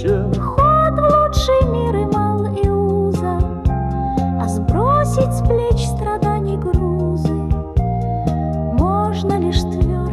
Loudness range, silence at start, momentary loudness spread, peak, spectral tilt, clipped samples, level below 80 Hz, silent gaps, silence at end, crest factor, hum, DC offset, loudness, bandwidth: 3 LU; 0 s; 6 LU; -4 dBFS; -7.5 dB/octave; under 0.1%; -24 dBFS; none; 0 s; 12 dB; none; under 0.1%; -17 LUFS; 13 kHz